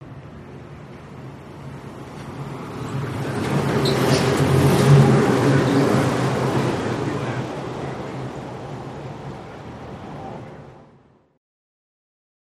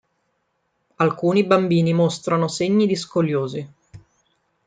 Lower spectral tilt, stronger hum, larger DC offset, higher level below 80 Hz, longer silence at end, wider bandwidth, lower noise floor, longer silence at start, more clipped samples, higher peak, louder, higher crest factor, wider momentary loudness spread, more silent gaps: about the same, -6.5 dB/octave vs -6.5 dB/octave; neither; neither; first, -48 dBFS vs -64 dBFS; first, 1.6 s vs 0.7 s; first, 14 kHz vs 9.4 kHz; second, -54 dBFS vs -71 dBFS; second, 0 s vs 1 s; neither; about the same, -2 dBFS vs -4 dBFS; about the same, -20 LUFS vs -20 LUFS; about the same, 20 dB vs 18 dB; first, 22 LU vs 8 LU; neither